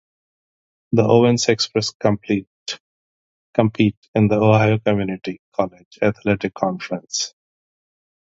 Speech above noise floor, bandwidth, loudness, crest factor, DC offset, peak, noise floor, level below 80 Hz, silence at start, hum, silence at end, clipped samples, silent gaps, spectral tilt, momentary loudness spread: over 72 dB; 7.8 kHz; -19 LUFS; 20 dB; under 0.1%; 0 dBFS; under -90 dBFS; -52 dBFS; 0.9 s; none; 1 s; under 0.1%; 1.95-2.00 s, 2.47-2.66 s, 2.80-3.53 s, 3.97-4.02 s, 4.08-4.14 s, 5.39-5.52 s, 5.85-5.91 s; -5.5 dB/octave; 13 LU